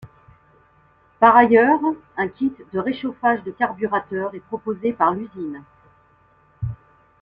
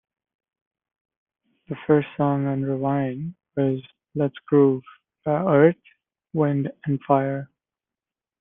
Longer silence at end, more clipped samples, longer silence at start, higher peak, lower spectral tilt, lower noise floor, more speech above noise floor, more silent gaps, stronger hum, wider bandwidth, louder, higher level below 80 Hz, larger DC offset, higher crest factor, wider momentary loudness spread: second, 0.45 s vs 0.95 s; neither; second, 0.05 s vs 1.7 s; about the same, -2 dBFS vs -4 dBFS; second, -9 dB/octave vs -12 dB/octave; second, -57 dBFS vs under -90 dBFS; second, 37 dB vs over 68 dB; neither; neither; first, 5.2 kHz vs 3.7 kHz; first, -20 LUFS vs -23 LUFS; first, -54 dBFS vs -64 dBFS; neither; about the same, 20 dB vs 20 dB; first, 18 LU vs 15 LU